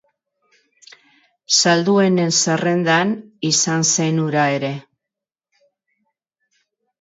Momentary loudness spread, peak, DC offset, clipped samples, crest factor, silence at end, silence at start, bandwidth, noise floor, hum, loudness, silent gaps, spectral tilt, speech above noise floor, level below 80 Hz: 9 LU; -2 dBFS; under 0.1%; under 0.1%; 18 dB; 2.2 s; 1.5 s; 8 kHz; -86 dBFS; none; -17 LUFS; none; -3.5 dB/octave; 69 dB; -68 dBFS